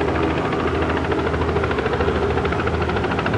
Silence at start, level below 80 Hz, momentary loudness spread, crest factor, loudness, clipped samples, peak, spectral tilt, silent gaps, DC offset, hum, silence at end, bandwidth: 0 s; -34 dBFS; 1 LU; 14 dB; -21 LUFS; under 0.1%; -6 dBFS; -7 dB/octave; none; under 0.1%; none; 0 s; 10.5 kHz